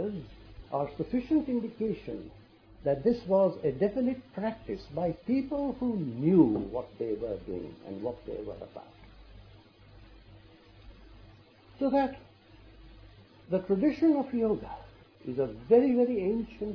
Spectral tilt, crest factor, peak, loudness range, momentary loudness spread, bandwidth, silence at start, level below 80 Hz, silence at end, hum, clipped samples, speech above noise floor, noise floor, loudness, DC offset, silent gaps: -10 dB/octave; 20 dB; -10 dBFS; 13 LU; 17 LU; 5.4 kHz; 0 s; -56 dBFS; 0 s; none; under 0.1%; 27 dB; -56 dBFS; -30 LUFS; under 0.1%; none